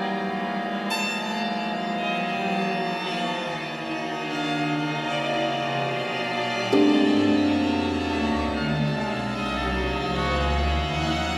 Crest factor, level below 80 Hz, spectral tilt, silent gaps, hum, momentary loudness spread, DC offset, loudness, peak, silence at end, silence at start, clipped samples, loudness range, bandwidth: 16 dB; -38 dBFS; -5.5 dB/octave; none; none; 7 LU; under 0.1%; -25 LUFS; -8 dBFS; 0 s; 0 s; under 0.1%; 4 LU; 14.5 kHz